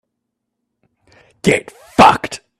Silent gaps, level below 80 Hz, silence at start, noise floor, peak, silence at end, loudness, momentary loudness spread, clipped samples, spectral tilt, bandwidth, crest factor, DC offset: none; -46 dBFS; 1.45 s; -76 dBFS; 0 dBFS; 0.25 s; -14 LUFS; 11 LU; under 0.1%; -4.5 dB/octave; 14.5 kHz; 18 dB; under 0.1%